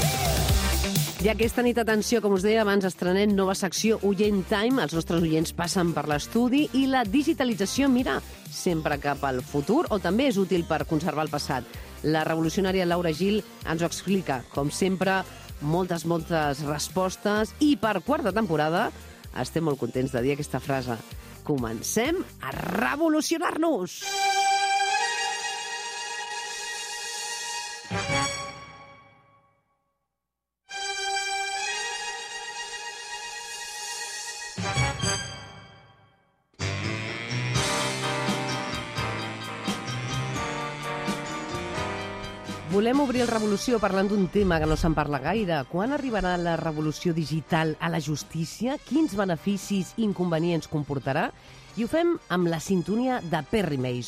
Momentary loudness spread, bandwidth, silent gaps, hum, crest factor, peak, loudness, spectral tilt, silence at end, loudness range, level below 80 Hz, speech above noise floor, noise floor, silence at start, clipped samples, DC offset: 9 LU; 15.5 kHz; none; none; 16 dB; -10 dBFS; -26 LUFS; -4.5 dB/octave; 0 s; 7 LU; -44 dBFS; 60 dB; -85 dBFS; 0 s; under 0.1%; under 0.1%